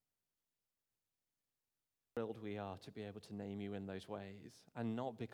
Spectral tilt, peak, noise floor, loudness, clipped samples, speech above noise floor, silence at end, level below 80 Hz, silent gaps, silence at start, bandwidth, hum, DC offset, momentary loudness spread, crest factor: -7 dB/octave; -30 dBFS; under -90 dBFS; -47 LUFS; under 0.1%; over 44 dB; 0 s; -86 dBFS; none; 2.15 s; 15 kHz; none; under 0.1%; 7 LU; 18 dB